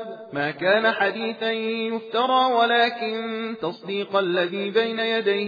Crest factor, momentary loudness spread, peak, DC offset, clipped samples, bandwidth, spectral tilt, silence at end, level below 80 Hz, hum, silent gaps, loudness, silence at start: 16 dB; 9 LU; -8 dBFS; under 0.1%; under 0.1%; 5 kHz; -6 dB/octave; 0 s; -78 dBFS; none; none; -23 LUFS; 0 s